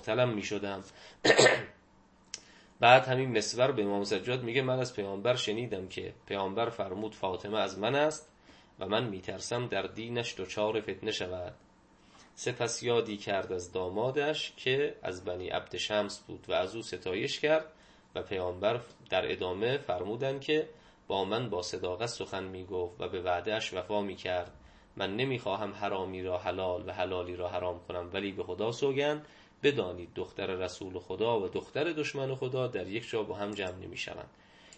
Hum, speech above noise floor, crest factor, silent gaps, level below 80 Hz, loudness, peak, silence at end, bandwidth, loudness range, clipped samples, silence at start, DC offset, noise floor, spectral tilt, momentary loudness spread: none; 30 dB; 26 dB; none; -66 dBFS; -32 LUFS; -6 dBFS; 0.1 s; 8.8 kHz; 7 LU; under 0.1%; 0 s; under 0.1%; -62 dBFS; -4 dB/octave; 10 LU